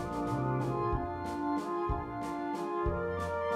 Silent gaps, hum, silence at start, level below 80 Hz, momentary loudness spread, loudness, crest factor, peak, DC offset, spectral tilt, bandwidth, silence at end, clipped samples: none; none; 0 s; -44 dBFS; 4 LU; -34 LUFS; 14 dB; -20 dBFS; under 0.1%; -7.5 dB/octave; 14 kHz; 0 s; under 0.1%